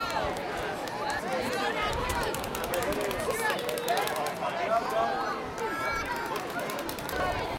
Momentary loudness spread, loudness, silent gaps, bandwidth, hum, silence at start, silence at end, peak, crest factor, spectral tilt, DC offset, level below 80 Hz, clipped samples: 5 LU; -30 LUFS; none; 17 kHz; none; 0 s; 0 s; -12 dBFS; 18 dB; -3.5 dB/octave; under 0.1%; -48 dBFS; under 0.1%